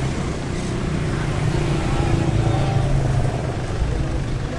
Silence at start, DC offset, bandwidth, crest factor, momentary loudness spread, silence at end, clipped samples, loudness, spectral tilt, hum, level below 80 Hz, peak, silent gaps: 0 s; under 0.1%; 11.5 kHz; 14 dB; 5 LU; 0 s; under 0.1%; -22 LUFS; -6.5 dB/octave; none; -28 dBFS; -6 dBFS; none